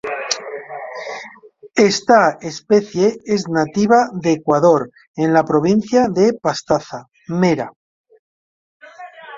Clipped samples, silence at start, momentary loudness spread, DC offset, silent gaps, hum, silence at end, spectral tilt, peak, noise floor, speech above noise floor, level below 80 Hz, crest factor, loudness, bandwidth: under 0.1%; 0.05 s; 17 LU; under 0.1%; 5.07-5.14 s, 7.76-8.04 s, 8.19-8.80 s; none; 0 s; -5.5 dB/octave; 0 dBFS; -42 dBFS; 27 dB; -56 dBFS; 16 dB; -16 LUFS; 7.8 kHz